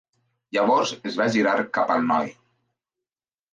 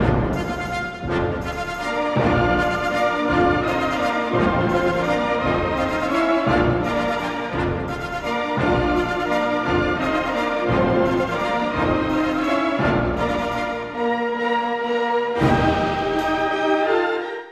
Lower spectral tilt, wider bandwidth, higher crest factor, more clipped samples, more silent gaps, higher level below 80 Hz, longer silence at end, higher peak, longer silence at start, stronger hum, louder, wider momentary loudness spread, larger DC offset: second, -4.5 dB/octave vs -6.5 dB/octave; second, 9.6 kHz vs 13 kHz; about the same, 18 dB vs 16 dB; neither; neither; second, -72 dBFS vs -36 dBFS; first, 1.2 s vs 0 s; second, -8 dBFS vs -4 dBFS; first, 0.55 s vs 0 s; neither; about the same, -22 LUFS vs -21 LUFS; about the same, 6 LU vs 6 LU; neither